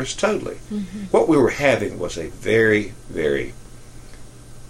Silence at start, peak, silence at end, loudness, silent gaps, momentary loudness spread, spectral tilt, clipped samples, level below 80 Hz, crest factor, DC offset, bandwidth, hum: 0 s; -2 dBFS; 0 s; -20 LUFS; none; 13 LU; -5 dB/octave; under 0.1%; -42 dBFS; 20 dB; under 0.1%; 14 kHz; none